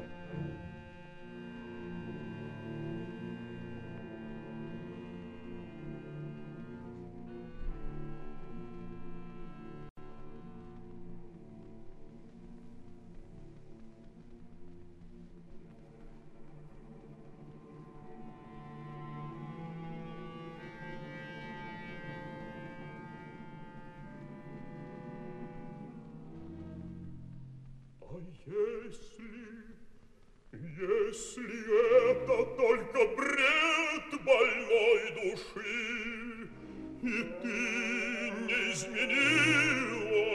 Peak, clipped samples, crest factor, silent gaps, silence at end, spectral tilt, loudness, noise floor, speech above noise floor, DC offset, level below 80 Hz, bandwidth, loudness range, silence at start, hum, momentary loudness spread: -14 dBFS; under 0.1%; 22 dB; 9.90-9.96 s; 0 s; -4.5 dB/octave; -32 LUFS; -58 dBFS; 27 dB; under 0.1%; -54 dBFS; 12 kHz; 26 LU; 0 s; none; 26 LU